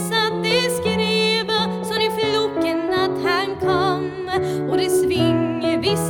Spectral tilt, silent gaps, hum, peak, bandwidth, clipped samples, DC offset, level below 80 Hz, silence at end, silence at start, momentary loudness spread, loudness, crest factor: -4.5 dB/octave; none; none; -6 dBFS; 19 kHz; under 0.1%; under 0.1%; -50 dBFS; 0 s; 0 s; 4 LU; -20 LUFS; 14 dB